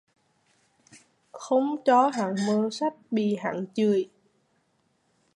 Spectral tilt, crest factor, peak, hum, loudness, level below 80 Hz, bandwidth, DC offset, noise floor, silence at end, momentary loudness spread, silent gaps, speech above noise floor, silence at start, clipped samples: -6 dB/octave; 18 dB; -10 dBFS; none; -25 LUFS; -80 dBFS; 11 kHz; under 0.1%; -70 dBFS; 1.3 s; 9 LU; none; 46 dB; 0.95 s; under 0.1%